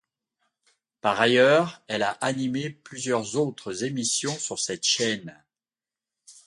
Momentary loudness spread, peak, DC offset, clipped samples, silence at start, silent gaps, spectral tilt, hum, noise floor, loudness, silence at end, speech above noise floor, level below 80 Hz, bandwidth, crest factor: 13 LU; -4 dBFS; under 0.1%; under 0.1%; 1.05 s; none; -3 dB/octave; none; under -90 dBFS; -25 LUFS; 0.15 s; over 65 dB; -70 dBFS; 11.5 kHz; 22 dB